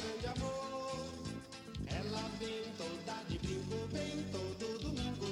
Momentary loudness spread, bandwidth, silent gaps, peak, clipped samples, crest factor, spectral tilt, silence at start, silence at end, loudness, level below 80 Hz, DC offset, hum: 5 LU; 16.5 kHz; none; -28 dBFS; under 0.1%; 14 dB; -5 dB/octave; 0 s; 0 s; -42 LUFS; -54 dBFS; under 0.1%; none